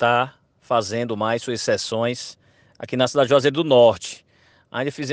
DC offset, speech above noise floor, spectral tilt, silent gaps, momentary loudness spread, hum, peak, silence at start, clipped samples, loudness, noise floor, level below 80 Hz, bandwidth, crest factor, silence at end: under 0.1%; 35 dB; -4.5 dB/octave; none; 17 LU; none; -4 dBFS; 0 s; under 0.1%; -20 LUFS; -55 dBFS; -64 dBFS; 9.8 kHz; 18 dB; 0 s